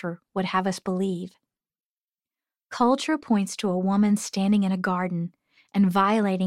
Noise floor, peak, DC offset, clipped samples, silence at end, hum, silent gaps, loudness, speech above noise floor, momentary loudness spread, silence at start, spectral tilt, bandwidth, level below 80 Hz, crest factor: under -90 dBFS; -8 dBFS; under 0.1%; under 0.1%; 0 s; none; 1.85-2.08 s; -24 LUFS; over 66 dB; 10 LU; 0.05 s; -6 dB/octave; 13 kHz; -70 dBFS; 18 dB